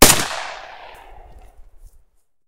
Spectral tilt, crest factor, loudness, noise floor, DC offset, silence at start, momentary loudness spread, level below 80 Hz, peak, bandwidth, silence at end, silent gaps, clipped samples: -2 dB/octave; 20 dB; -17 LUFS; -58 dBFS; under 0.1%; 0 s; 27 LU; -34 dBFS; 0 dBFS; 18 kHz; 0.85 s; none; 0.2%